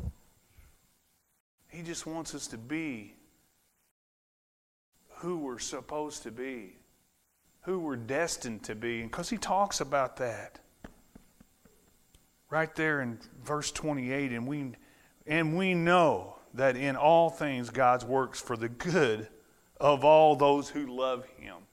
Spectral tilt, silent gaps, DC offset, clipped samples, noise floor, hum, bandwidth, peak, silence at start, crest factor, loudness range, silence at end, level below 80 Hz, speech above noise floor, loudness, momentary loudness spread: -5 dB/octave; 1.40-1.58 s, 3.91-4.92 s; under 0.1%; under 0.1%; -72 dBFS; none; 16 kHz; -10 dBFS; 0 s; 22 dB; 14 LU; 0.15 s; -58 dBFS; 42 dB; -30 LUFS; 17 LU